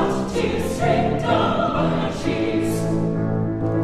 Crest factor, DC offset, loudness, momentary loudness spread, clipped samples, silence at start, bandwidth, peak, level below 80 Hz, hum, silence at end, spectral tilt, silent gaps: 14 dB; under 0.1%; -21 LUFS; 4 LU; under 0.1%; 0 s; 14.5 kHz; -6 dBFS; -38 dBFS; none; 0 s; -6.5 dB/octave; none